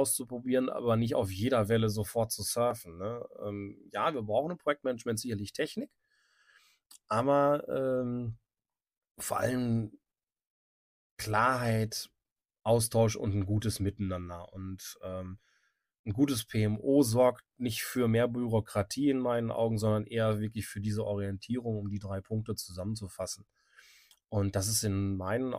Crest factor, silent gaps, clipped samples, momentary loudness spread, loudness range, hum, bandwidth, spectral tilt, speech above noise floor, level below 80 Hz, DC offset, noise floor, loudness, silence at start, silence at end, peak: 20 dB; 9.11-9.15 s, 10.50-11.17 s, 12.32-12.36 s, 15.99-16.04 s; under 0.1%; 13 LU; 6 LU; none; 15.5 kHz; -5.5 dB/octave; over 59 dB; -58 dBFS; under 0.1%; under -90 dBFS; -32 LUFS; 0 s; 0 s; -12 dBFS